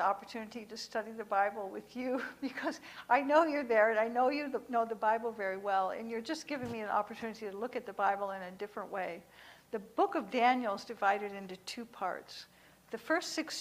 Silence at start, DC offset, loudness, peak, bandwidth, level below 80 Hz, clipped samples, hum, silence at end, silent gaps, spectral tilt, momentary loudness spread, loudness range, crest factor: 0 s; under 0.1%; -34 LUFS; -14 dBFS; 15.5 kHz; -76 dBFS; under 0.1%; none; 0 s; none; -4 dB/octave; 15 LU; 6 LU; 20 dB